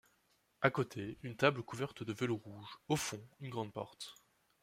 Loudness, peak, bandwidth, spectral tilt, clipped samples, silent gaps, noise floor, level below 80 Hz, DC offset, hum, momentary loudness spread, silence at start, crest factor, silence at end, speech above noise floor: -38 LUFS; -14 dBFS; 16 kHz; -5 dB/octave; under 0.1%; none; -76 dBFS; -72 dBFS; under 0.1%; none; 15 LU; 0.6 s; 26 dB; 0.5 s; 37 dB